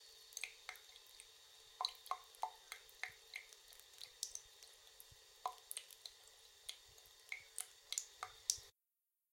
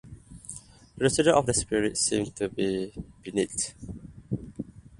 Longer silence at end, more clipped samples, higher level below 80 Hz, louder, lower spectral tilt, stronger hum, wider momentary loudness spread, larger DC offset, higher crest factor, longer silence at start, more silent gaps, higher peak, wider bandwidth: first, 0.6 s vs 0.05 s; neither; second, -82 dBFS vs -50 dBFS; second, -49 LUFS vs -27 LUFS; second, 2.5 dB/octave vs -4 dB/octave; neither; second, 16 LU vs 20 LU; neither; first, 40 dB vs 22 dB; about the same, 0 s vs 0.05 s; neither; second, -12 dBFS vs -8 dBFS; first, 16.5 kHz vs 11.5 kHz